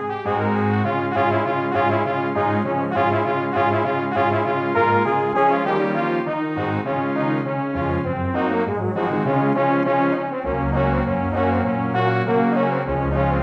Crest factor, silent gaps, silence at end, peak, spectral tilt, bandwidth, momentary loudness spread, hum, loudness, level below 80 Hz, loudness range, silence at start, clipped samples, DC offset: 14 dB; none; 0 s; -6 dBFS; -9 dB/octave; 7 kHz; 5 LU; none; -21 LUFS; -38 dBFS; 2 LU; 0 s; under 0.1%; under 0.1%